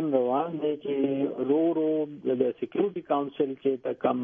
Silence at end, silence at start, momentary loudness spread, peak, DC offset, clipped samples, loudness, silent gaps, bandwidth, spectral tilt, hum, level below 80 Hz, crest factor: 0 s; 0 s; 4 LU; -10 dBFS; under 0.1%; under 0.1%; -28 LUFS; none; 3.7 kHz; -10 dB/octave; none; -74 dBFS; 16 dB